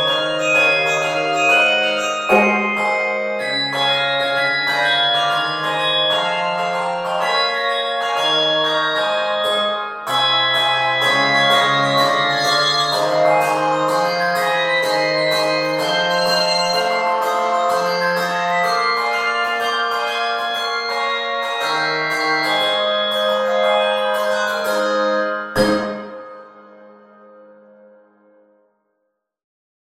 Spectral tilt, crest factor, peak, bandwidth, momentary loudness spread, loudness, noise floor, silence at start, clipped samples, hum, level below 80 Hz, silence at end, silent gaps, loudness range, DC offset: -2.5 dB/octave; 18 dB; 0 dBFS; 16.5 kHz; 6 LU; -17 LUFS; -73 dBFS; 0 s; under 0.1%; none; -56 dBFS; 3 s; none; 4 LU; under 0.1%